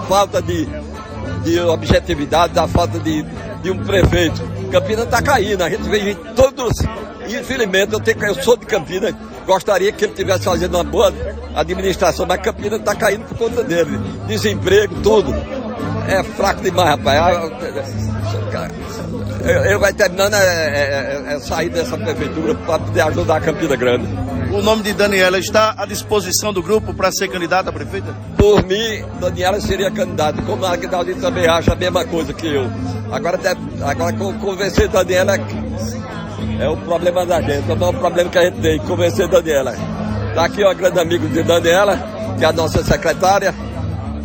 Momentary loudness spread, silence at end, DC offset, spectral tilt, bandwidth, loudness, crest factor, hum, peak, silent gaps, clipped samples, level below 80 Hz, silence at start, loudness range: 10 LU; 0 s; under 0.1%; -5 dB/octave; 17 kHz; -17 LUFS; 16 dB; none; 0 dBFS; none; under 0.1%; -32 dBFS; 0 s; 2 LU